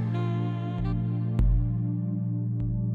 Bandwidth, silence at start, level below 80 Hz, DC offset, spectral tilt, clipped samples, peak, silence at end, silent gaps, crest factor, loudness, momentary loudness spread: 4.4 kHz; 0 s; -32 dBFS; under 0.1%; -10.5 dB/octave; under 0.1%; -14 dBFS; 0 s; none; 12 dB; -28 LUFS; 4 LU